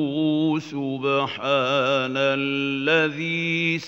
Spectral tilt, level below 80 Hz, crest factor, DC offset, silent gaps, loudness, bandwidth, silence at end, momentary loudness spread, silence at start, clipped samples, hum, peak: -5.5 dB/octave; -72 dBFS; 16 dB; under 0.1%; none; -22 LUFS; 7.6 kHz; 0 s; 4 LU; 0 s; under 0.1%; none; -6 dBFS